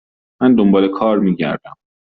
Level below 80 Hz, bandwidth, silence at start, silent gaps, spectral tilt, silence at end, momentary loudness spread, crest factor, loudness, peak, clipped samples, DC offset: -54 dBFS; 4.8 kHz; 0.4 s; none; -6.5 dB/octave; 0.5 s; 9 LU; 12 dB; -15 LUFS; -2 dBFS; under 0.1%; under 0.1%